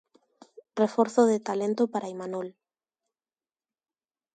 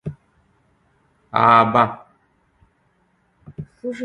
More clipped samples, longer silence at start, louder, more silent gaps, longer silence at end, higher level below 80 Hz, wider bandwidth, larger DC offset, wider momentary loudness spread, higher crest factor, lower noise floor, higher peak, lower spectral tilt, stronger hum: neither; first, 0.75 s vs 0.05 s; second, -27 LUFS vs -16 LUFS; neither; first, 1.85 s vs 0 s; second, -78 dBFS vs -56 dBFS; about the same, 9.2 kHz vs 9.4 kHz; neither; second, 14 LU vs 25 LU; about the same, 20 dB vs 22 dB; first, under -90 dBFS vs -63 dBFS; second, -8 dBFS vs 0 dBFS; about the same, -6 dB/octave vs -7 dB/octave; neither